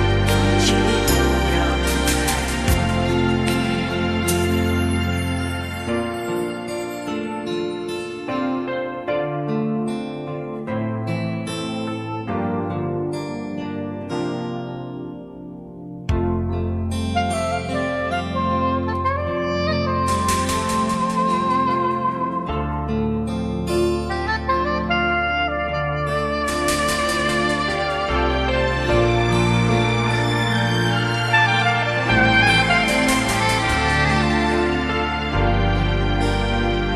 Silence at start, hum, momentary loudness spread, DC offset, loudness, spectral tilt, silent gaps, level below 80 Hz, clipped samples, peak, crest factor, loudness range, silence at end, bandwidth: 0 s; none; 9 LU; under 0.1%; -21 LUFS; -5 dB/octave; none; -32 dBFS; under 0.1%; -4 dBFS; 18 dB; 9 LU; 0 s; 14 kHz